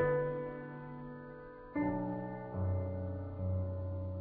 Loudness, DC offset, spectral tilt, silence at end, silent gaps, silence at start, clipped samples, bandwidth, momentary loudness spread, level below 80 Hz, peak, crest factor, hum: -39 LUFS; under 0.1%; -9.5 dB/octave; 0 s; none; 0 s; under 0.1%; 3.5 kHz; 12 LU; -56 dBFS; -22 dBFS; 16 dB; none